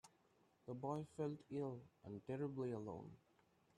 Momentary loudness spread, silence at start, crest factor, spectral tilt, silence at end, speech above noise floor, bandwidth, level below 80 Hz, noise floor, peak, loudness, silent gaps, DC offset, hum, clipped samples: 12 LU; 0.05 s; 18 dB; -8.5 dB/octave; 0.6 s; 29 dB; 11.5 kHz; -82 dBFS; -77 dBFS; -32 dBFS; -49 LUFS; none; under 0.1%; none; under 0.1%